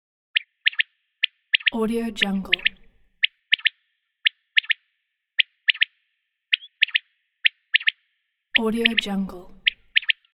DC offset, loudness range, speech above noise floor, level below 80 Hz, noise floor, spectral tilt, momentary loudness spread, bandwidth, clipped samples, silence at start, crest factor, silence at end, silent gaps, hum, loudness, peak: under 0.1%; 1 LU; 53 dB; -56 dBFS; -77 dBFS; -3.5 dB/octave; 6 LU; 15.5 kHz; under 0.1%; 0.35 s; 24 dB; 0.2 s; none; none; -22 LUFS; -2 dBFS